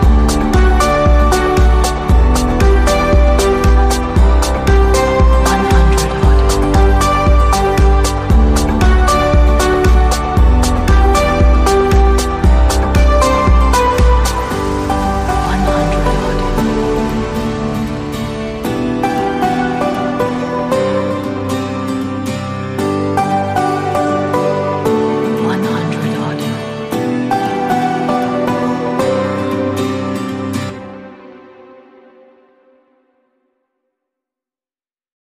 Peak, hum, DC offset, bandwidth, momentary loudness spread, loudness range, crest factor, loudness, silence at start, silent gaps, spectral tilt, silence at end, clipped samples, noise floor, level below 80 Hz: 0 dBFS; none; under 0.1%; 15 kHz; 8 LU; 6 LU; 12 dB; -14 LUFS; 0 s; none; -6 dB/octave; 3.95 s; under 0.1%; under -90 dBFS; -16 dBFS